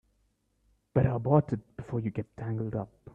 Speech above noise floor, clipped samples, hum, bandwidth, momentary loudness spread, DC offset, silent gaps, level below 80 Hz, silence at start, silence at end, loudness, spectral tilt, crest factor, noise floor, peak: 43 dB; under 0.1%; none; 3.4 kHz; 11 LU; under 0.1%; none; -56 dBFS; 0.95 s; 0.3 s; -31 LUFS; -11 dB/octave; 20 dB; -73 dBFS; -10 dBFS